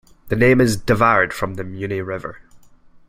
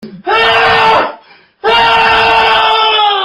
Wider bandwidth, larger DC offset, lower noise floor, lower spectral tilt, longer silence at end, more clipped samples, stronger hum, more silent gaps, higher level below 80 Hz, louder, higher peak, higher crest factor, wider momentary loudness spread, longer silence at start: first, 16 kHz vs 13 kHz; neither; first, -47 dBFS vs -38 dBFS; first, -6 dB/octave vs -3 dB/octave; first, 0.5 s vs 0 s; neither; neither; neither; about the same, -42 dBFS vs -40 dBFS; second, -18 LUFS vs -8 LUFS; about the same, -2 dBFS vs 0 dBFS; first, 18 dB vs 10 dB; first, 14 LU vs 6 LU; first, 0.25 s vs 0 s